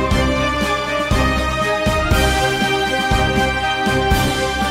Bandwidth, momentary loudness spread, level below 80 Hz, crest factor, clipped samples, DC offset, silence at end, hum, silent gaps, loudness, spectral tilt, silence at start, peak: 16 kHz; 2 LU; -26 dBFS; 14 dB; under 0.1%; under 0.1%; 0 s; none; none; -17 LUFS; -4.5 dB/octave; 0 s; -4 dBFS